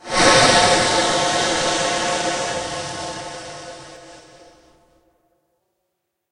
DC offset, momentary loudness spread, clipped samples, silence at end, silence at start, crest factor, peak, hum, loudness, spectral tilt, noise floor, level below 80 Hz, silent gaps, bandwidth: under 0.1%; 22 LU; under 0.1%; 2.1 s; 0.05 s; 20 dB; 0 dBFS; none; -17 LUFS; -2 dB/octave; -76 dBFS; -46 dBFS; none; 11.5 kHz